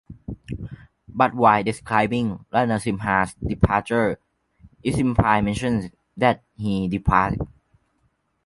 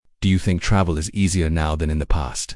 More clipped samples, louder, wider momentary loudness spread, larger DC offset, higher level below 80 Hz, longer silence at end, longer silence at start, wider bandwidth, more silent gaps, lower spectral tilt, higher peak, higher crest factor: neither; about the same, -22 LUFS vs -21 LUFS; first, 16 LU vs 4 LU; neither; second, -38 dBFS vs -28 dBFS; first, 1 s vs 0 s; about the same, 0.1 s vs 0.2 s; about the same, 11.5 kHz vs 12 kHz; neither; about the same, -6.5 dB/octave vs -5.5 dB/octave; about the same, -2 dBFS vs -4 dBFS; first, 22 dB vs 16 dB